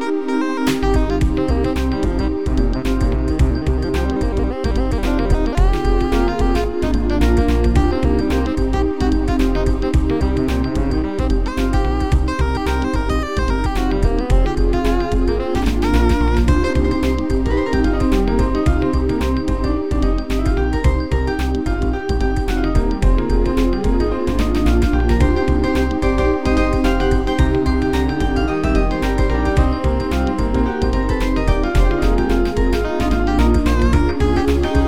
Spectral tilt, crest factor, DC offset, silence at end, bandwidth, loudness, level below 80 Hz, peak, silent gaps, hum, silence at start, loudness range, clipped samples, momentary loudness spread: -7 dB/octave; 14 dB; 3%; 0 s; 14 kHz; -18 LUFS; -18 dBFS; -2 dBFS; none; none; 0 s; 2 LU; under 0.1%; 4 LU